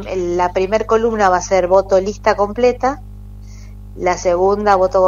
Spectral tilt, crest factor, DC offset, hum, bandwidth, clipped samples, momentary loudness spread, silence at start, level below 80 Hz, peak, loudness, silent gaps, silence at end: -5 dB/octave; 16 dB; under 0.1%; 50 Hz at -35 dBFS; 7.6 kHz; under 0.1%; 7 LU; 0 s; -34 dBFS; 0 dBFS; -15 LUFS; none; 0 s